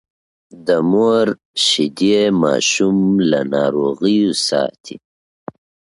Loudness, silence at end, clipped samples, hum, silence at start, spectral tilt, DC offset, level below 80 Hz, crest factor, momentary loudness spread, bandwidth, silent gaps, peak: -15 LUFS; 0.95 s; under 0.1%; none; 0.55 s; -4.5 dB/octave; under 0.1%; -56 dBFS; 14 dB; 21 LU; 11.5 kHz; 1.45-1.54 s, 4.80-4.84 s; -2 dBFS